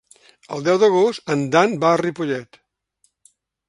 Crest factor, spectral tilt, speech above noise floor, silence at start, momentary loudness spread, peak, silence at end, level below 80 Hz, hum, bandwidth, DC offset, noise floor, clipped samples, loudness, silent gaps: 20 dB; -5.5 dB/octave; 48 dB; 0.5 s; 10 LU; 0 dBFS; 1.25 s; -66 dBFS; none; 11.5 kHz; under 0.1%; -66 dBFS; under 0.1%; -18 LUFS; none